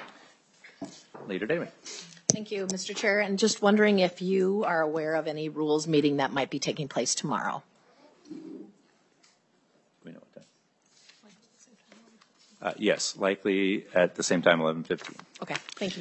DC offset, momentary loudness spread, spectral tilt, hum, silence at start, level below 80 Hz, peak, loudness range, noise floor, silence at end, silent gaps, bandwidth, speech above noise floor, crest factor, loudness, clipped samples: under 0.1%; 20 LU; -4 dB/octave; none; 0 s; -76 dBFS; -2 dBFS; 9 LU; -67 dBFS; 0 s; none; 8.8 kHz; 40 dB; 28 dB; -27 LUFS; under 0.1%